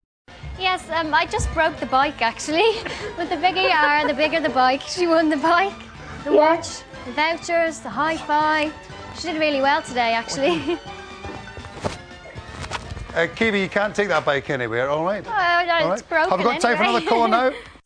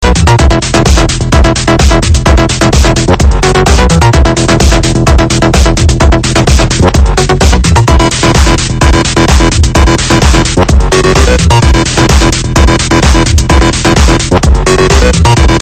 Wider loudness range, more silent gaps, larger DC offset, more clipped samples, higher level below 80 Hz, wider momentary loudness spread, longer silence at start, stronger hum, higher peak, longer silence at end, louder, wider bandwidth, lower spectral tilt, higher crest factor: first, 5 LU vs 0 LU; neither; second, under 0.1% vs 1%; second, under 0.1% vs 5%; second, -44 dBFS vs -10 dBFS; first, 16 LU vs 2 LU; first, 0.3 s vs 0 s; neither; second, -4 dBFS vs 0 dBFS; about the same, 0.1 s vs 0 s; second, -20 LUFS vs -7 LUFS; second, 10.5 kHz vs 14 kHz; about the same, -4 dB/octave vs -4.5 dB/octave; first, 18 dB vs 6 dB